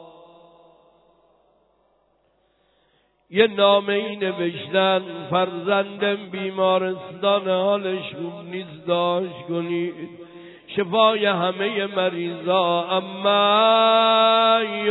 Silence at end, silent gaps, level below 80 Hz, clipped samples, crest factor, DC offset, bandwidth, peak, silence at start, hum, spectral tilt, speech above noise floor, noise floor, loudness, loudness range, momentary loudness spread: 0 s; none; -72 dBFS; under 0.1%; 18 dB; under 0.1%; 4.1 kHz; -4 dBFS; 0 s; none; -7.5 dB/octave; 44 dB; -65 dBFS; -20 LUFS; 6 LU; 13 LU